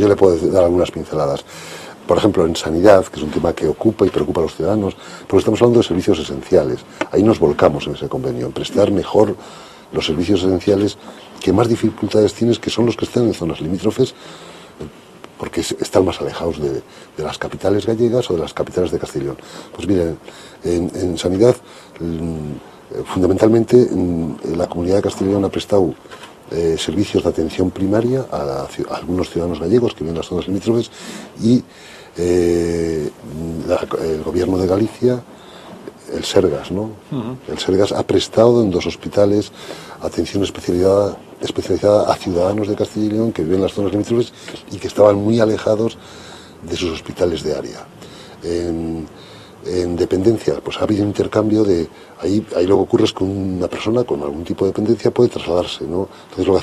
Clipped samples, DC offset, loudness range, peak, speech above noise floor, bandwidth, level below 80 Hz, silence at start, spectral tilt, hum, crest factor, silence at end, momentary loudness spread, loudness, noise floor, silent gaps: under 0.1%; under 0.1%; 5 LU; 0 dBFS; 23 dB; 13 kHz; -44 dBFS; 0 s; -6.5 dB/octave; none; 18 dB; 0 s; 16 LU; -18 LUFS; -40 dBFS; none